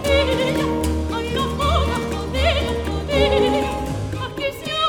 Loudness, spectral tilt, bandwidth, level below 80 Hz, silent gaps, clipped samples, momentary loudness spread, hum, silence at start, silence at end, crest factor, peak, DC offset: -21 LUFS; -5.5 dB/octave; 17.5 kHz; -28 dBFS; none; under 0.1%; 8 LU; none; 0 s; 0 s; 14 dB; -6 dBFS; under 0.1%